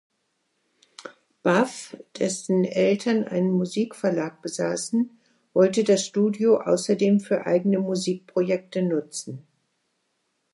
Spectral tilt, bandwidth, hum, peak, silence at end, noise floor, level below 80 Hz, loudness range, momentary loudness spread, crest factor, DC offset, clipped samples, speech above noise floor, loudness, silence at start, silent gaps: -5.5 dB/octave; 11.5 kHz; none; -6 dBFS; 1.15 s; -74 dBFS; -76 dBFS; 3 LU; 12 LU; 18 dB; under 0.1%; under 0.1%; 51 dB; -24 LUFS; 1 s; none